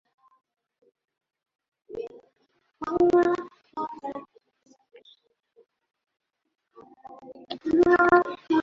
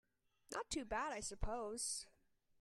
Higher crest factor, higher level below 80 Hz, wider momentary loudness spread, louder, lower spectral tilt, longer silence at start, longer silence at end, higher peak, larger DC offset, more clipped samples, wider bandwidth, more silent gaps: about the same, 20 dB vs 22 dB; second, -62 dBFS vs -56 dBFS; first, 23 LU vs 7 LU; first, -23 LUFS vs -45 LUFS; first, -6.5 dB/octave vs -2.5 dB/octave; first, 1.9 s vs 0.5 s; second, 0 s vs 0.55 s; first, -8 dBFS vs -26 dBFS; neither; neither; second, 7 kHz vs 13 kHz; neither